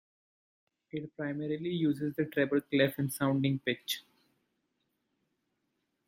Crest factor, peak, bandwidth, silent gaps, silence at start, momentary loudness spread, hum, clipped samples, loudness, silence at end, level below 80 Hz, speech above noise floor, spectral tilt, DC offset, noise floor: 22 dB; -14 dBFS; 16.5 kHz; none; 0.95 s; 9 LU; none; under 0.1%; -32 LUFS; 2.05 s; -74 dBFS; 49 dB; -5.5 dB/octave; under 0.1%; -81 dBFS